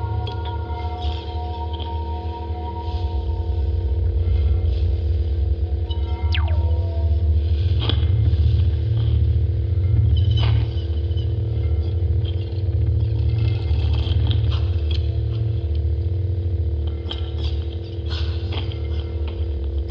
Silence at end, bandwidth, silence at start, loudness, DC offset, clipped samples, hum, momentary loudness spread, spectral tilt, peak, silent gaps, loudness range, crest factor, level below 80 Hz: 0 s; 5.6 kHz; 0 s; -22 LUFS; under 0.1%; under 0.1%; none; 8 LU; -9 dB/octave; -6 dBFS; none; 6 LU; 14 dB; -24 dBFS